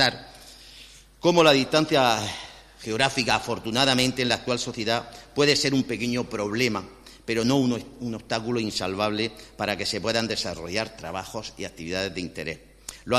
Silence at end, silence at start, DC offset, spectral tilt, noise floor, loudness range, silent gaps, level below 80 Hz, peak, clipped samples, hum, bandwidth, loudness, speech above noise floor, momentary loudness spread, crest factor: 0 s; 0 s; under 0.1%; -4 dB/octave; -48 dBFS; 6 LU; none; -54 dBFS; -4 dBFS; under 0.1%; none; 14.5 kHz; -25 LUFS; 24 dB; 18 LU; 20 dB